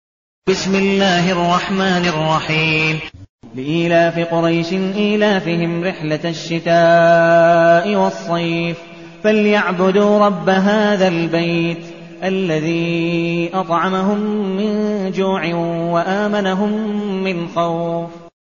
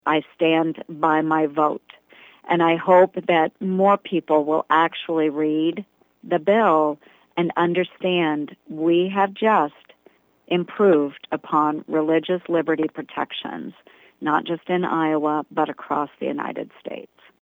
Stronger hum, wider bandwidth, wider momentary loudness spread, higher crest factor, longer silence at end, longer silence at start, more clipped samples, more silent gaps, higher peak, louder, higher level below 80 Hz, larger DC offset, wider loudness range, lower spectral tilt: neither; second, 7.4 kHz vs over 20 kHz; second, 9 LU vs 12 LU; about the same, 14 dB vs 18 dB; second, 0.2 s vs 0.4 s; first, 0.45 s vs 0.05 s; neither; first, 3.29-3.39 s vs none; about the same, -2 dBFS vs -4 dBFS; first, -16 LUFS vs -21 LUFS; first, -52 dBFS vs -74 dBFS; first, 0.3% vs under 0.1%; about the same, 5 LU vs 5 LU; second, -4.5 dB/octave vs -8 dB/octave